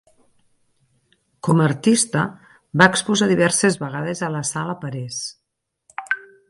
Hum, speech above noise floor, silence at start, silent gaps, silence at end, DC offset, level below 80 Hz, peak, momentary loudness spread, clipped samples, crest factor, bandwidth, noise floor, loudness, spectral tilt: none; 59 dB; 1.45 s; none; 0.3 s; under 0.1%; -60 dBFS; 0 dBFS; 13 LU; under 0.1%; 22 dB; 11.5 kHz; -78 dBFS; -20 LUFS; -4 dB/octave